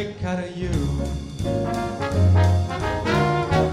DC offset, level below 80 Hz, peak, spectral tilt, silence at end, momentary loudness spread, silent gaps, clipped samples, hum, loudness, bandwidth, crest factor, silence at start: under 0.1%; -34 dBFS; -6 dBFS; -7 dB/octave; 0 s; 9 LU; none; under 0.1%; none; -23 LUFS; 11.5 kHz; 14 dB; 0 s